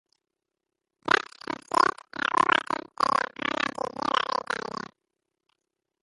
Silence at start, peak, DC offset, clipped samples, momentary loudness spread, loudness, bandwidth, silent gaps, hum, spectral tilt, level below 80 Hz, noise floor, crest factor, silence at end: 1.05 s; -4 dBFS; under 0.1%; under 0.1%; 13 LU; -27 LUFS; 11.5 kHz; none; none; -2.5 dB/octave; -68 dBFS; -86 dBFS; 26 dB; 1.45 s